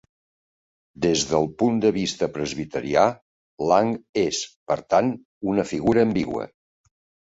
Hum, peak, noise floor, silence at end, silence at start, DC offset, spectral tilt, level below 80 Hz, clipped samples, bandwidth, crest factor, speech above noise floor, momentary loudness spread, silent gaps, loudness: none; -4 dBFS; under -90 dBFS; 0.75 s; 1 s; under 0.1%; -5 dB/octave; -54 dBFS; under 0.1%; 8 kHz; 20 dB; over 68 dB; 9 LU; 3.22-3.58 s, 4.09-4.13 s, 4.56-4.66 s, 5.25-5.41 s; -23 LUFS